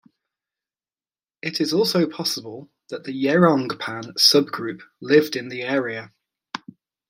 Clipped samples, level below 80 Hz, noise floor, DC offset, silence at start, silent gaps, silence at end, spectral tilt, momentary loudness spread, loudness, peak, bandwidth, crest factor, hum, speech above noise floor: under 0.1%; -72 dBFS; under -90 dBFS; under 0.1%; 1.45 s; none; 0.5 s; -4 dB/octave; 20 LU; -20 LUFS; -2 dBFS; 16 kHz; 22 dB; none; over 69 dB